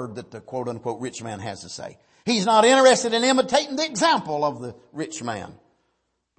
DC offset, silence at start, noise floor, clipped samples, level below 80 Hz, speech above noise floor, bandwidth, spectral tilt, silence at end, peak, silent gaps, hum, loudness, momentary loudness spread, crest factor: under 0.1%; 0 s; -74 dBFS; under 0.1%; -66 dBFS; 51 dB; 8.8 kHz; -3 dB/octave; 0.85 s; -4 dBFS; none; none; -21 LUFS; 20 LU; 20 dB